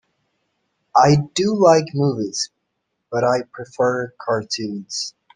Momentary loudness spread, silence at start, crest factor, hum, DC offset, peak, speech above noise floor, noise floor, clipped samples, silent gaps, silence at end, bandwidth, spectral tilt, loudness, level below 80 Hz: 12 LU; 0.95 s; 20 dB; none; under 0.1%; 0 dBFS; 56 dB; -75 dBFS; under 0.1%; none; 0.25 s; 9.8 kHz; -5 dB/octave; -19 LUFS; -56 dBFS